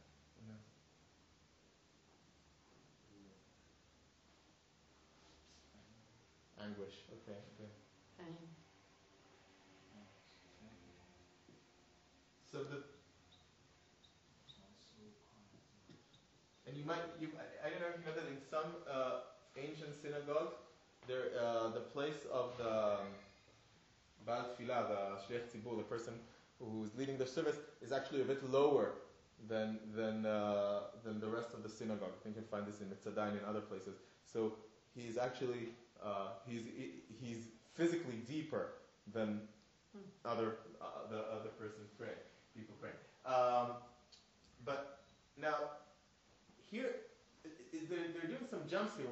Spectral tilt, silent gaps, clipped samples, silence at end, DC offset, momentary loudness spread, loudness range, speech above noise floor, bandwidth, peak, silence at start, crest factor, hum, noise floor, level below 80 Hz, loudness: -4.5 dB/octave; none; under 0.1%; 0 s; under 0.1%; 23 LU; 19 LU; 28 dB; 8 kHz; -20 dBFS; 0 s; 24 dB; none; -71 dBFS; -80 dBFS; -44 LUFS